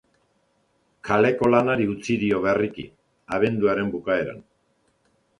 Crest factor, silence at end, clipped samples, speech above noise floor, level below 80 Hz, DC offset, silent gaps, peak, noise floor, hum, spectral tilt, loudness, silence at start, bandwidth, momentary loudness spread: 20 dB; 1 s; under 0.1%; 45 dB; -56 dBFS; under 0.1%; none; -4 dBFS; -67 dBFS; none; -7 dB/octave; -22 LUFS; 1.05 s; 11 kHz; 17 LU